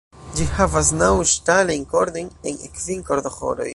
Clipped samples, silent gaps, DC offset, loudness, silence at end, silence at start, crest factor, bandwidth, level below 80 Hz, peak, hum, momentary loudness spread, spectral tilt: under 0.1%; none; under 0.1%; -20 LUFS; 0 s; 0.15 s; 18 dB; 11.5 kHz; -34 dBFS; -2 dBFS; none; 13 LU; -3.5 dB/octave